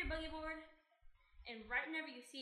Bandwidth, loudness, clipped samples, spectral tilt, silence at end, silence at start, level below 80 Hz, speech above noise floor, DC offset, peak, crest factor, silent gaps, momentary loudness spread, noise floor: 13 kHz; -45 LUFS; under 0.1%; -4.5 dB/octave; 0 s; 0 s; -58 dBFS; 20 dB; under 0.1%; -26 dBFS; 20 dB; none; 14 LU; -66 dBFS